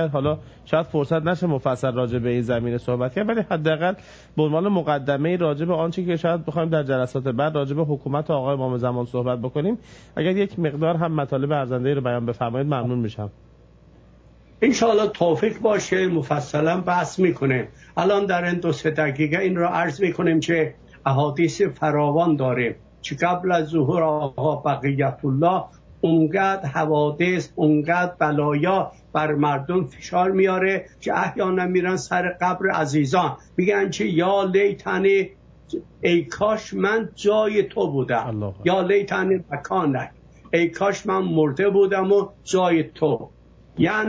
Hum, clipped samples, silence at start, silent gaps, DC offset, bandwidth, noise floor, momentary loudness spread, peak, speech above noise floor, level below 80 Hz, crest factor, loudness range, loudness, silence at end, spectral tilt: none; under 0.1%; 0 s; none; under 0.1%; 8 kHz; -50 dBFS; 6 LU; -4 dBFS; 29 dB; -54 dBFS; 18 dB; 3 LU; -22 LUFS; 0 s; -6.5 dB/octave